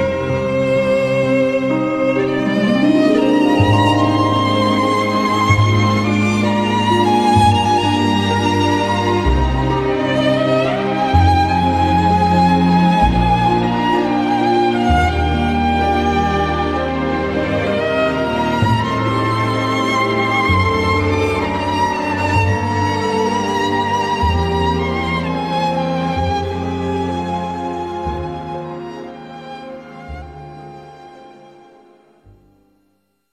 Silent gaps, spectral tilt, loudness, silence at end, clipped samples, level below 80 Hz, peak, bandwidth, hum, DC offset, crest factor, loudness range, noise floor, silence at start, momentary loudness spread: none; -6.5 dB/octave; -16 LUFS; 2 s; under 0.1%; -32 dBFS; 0 dBFS; 13.5 kHz; none; under 0.1%; 16 dB; 9 LU; -63 dBFS; 0 s; 10 LU